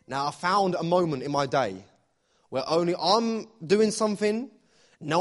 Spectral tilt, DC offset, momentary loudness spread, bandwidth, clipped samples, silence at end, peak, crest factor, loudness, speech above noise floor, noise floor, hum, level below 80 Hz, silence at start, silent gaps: -5 dB/octave; under 0.1%; 11 LU; 11.5 kHz; under 0.1%; 0 s; -8 dBFS; 20 dB; -26 LUFS; 43 dB; -68 dBFS; none; -66 dBFS; 0.1 s; none